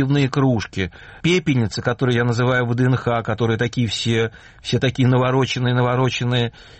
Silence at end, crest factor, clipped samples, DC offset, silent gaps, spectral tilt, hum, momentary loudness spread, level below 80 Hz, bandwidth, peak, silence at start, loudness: 0.15 s; 12 dB; under 0.1%; under 0.1%; none; -6 dB/octave; none; 6 LU; -46 dBFS; 8.6 kHz; -6 dBFS; 0 s; -19 LUFS